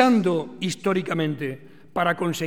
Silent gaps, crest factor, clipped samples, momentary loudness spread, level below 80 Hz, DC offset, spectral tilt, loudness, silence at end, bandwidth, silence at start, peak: none; 18 dB; under 0.1%; 11 LU; -68 dBFS; 0.4%; -5.5 dB/octave; -24 LUFS; 0 s; 16.5 kHz; 0 s; -4 dBFS